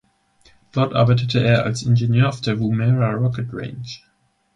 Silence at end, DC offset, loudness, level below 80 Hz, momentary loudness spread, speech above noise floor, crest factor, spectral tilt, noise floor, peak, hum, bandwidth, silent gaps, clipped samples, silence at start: 0.6 s; under 0.1%; -19 LUFS; -50 dBFS; 14 LU; 38 dB; 16 dB; -7 dB/octave; -56 dBFS; -4 dBFS; none; 9.4 kHz; none; under 0.1%; 0.75 s